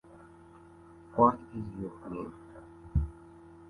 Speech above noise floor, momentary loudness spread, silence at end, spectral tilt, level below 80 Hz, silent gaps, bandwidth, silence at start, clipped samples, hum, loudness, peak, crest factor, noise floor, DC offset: 24 dB; 26 LU; 0 s; -10.5 dB/octave; -44 dBFS; none; 11 kHz; 0.15 s; under 0.1%; none; -32 LUFS; -10 dBFS; 24 dB; -54 dBFS; under 0.1%